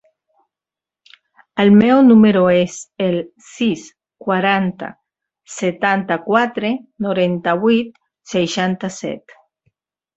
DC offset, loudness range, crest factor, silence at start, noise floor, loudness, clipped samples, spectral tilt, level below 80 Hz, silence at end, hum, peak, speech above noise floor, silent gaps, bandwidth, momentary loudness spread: under 0.1%; 6 LU; 16 dB; 1.55 s; -88 dBFS; -16 LUFS; under 0.1%; -6 dB/octave; -58 dBFS; 1 s; none; 0 dBFS; 73 dB; none; 8 kHz; 18 LU